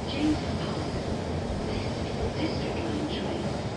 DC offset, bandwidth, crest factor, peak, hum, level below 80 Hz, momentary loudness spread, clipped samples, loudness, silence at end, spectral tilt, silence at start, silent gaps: under 0.1%; 11 kHz; 14 dB; -16 dBFS; none; -42 dBFS; 4 LU; under 0.1%; -30 LUFS; 0 s; -6 dB/octave; 0 s; none